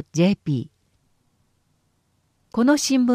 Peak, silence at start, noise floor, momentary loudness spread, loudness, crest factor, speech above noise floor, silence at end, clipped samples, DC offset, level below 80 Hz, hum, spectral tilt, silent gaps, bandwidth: -6 dBFS; 0.15 s; -67 dBFS; 11 LU; -21 LUFS; 18 dB; 48 dB; 0 s; under 0.1%; under 0.1%; -62 dBFS; none; -5 dB/octave; none; 15.5 kHz